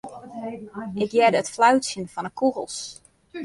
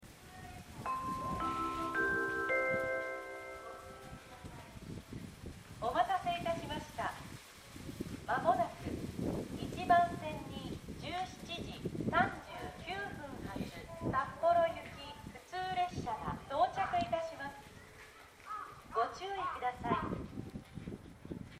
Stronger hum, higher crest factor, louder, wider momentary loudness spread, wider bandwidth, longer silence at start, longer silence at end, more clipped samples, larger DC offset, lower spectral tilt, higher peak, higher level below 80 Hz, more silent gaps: neither; about the same, 18 dB vs 22 dB; first, -22 LUFS vs -37 LUFS; about the same, 17 LU vs 18 LU; second, 11.5 kHz vs 16 kHz; about the same, 0.05 s vs 0 s; about the same, 0 s vs 0 s; neither; neither; second, -4 dB/octave vs -5.5 dB/octave; first, -6 dBFS vs -16 dBFS; second, -64 dBFS vs -58 dBFS; neither